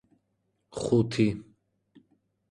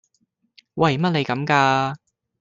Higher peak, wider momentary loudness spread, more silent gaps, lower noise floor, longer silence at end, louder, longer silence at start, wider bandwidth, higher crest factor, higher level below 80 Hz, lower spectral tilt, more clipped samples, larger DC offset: second, -12 dBFS vs -2 dBFS; about the same, 17 LU vs 15 LU; neither; first, -76 dBFS vs -69 dBFS; first, 1.1 s vs 0.45 s; second, -27 LUFS vs -20 LUFS; about the same, 0.75 s vs 0.75 s; first, 11 kHz vs 7.6 kHz; about the same, 20 dB vs 20 dB; about the same, -58 dBFS vs -62 dBFS; about the same, -7 dB/octave vs -6 dB/octave; neither; neither